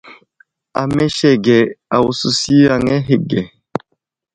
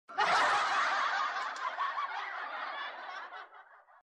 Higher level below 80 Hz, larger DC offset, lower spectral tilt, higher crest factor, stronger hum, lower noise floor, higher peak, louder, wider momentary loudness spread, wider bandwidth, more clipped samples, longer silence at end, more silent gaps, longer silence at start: first, -46 dBFS vs -80 dBFS; neither; first, -5.5 dB/octave vs -0.5 dB/octave; about the same, 16 dB vs 16 dB; neither; first, -70 dBFS vs -57 dBFS; first, 0 dBFS vs -18 dBFS; first, -14 LUFS vs -32 LUFS; about the same, 14 LU vs 16 LU; second, 9.8 kHz vs 12.5 kHz; neither; first, 0.85 s vs 0.2 s; neither; about the same, 0.05 s vs 0.1 s